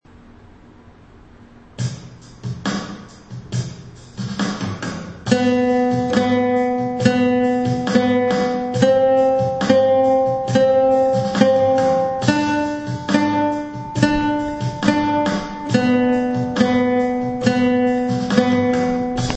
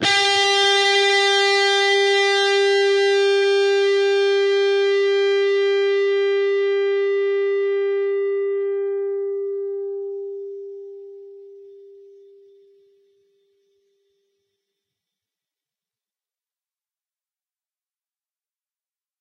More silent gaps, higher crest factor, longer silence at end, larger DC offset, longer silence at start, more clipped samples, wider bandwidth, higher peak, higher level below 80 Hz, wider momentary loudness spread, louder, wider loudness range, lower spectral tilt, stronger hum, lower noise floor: neither; about the same, 18 dB vs 16 dB; second, 0 s vs 7.45 s; neither; first, 0.85 s vs 0 s; neither; second, 8.6 kHz vs 10.5 kHz; first, 0 dBFS vs -6 dBFS; first, -46 dBFS vs -74 dBFS; about the same, 12 LU vs 13 LU; about the same, -18 LUFS vs -18 LUFS; second, 11 LU vs 16 LU; first, -6 dB/octave vs -1.5 dB/octave; neither; second, -45 dBFS vs under -90 dBFS